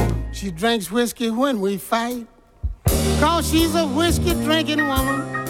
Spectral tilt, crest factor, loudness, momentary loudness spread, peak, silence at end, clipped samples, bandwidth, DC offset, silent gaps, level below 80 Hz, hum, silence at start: -4.5 dB/octave; 14 dB; -20 LUFS; 9 LU; -6 dBFS; 0 s; under 0.1%; 18 kHz; under 0.1%; none; -30 dBFS; none; 0 s